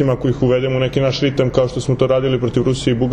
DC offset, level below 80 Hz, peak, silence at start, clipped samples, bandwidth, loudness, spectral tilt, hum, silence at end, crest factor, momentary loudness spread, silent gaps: under 0.1%; -36 dBFS; -2 dBFS; 0 s; under 0.1%; 9.8 kHz; -17 LUFS; -7 dB/octave; none; 0 s; 14 dB; 2 LU; none